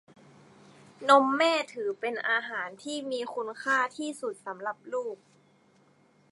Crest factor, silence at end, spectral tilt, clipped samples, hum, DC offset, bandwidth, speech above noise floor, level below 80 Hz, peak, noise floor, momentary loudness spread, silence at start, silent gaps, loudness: 24 dB; 1.15 s; -2.5 dB/octave; under 0.1%; none; under 0.1%; 11.5 kHz; 35 dB; -86 dBFS; -6 dBFS; -63 dBFS; 15 LU; 1 s; none; -29 LUFS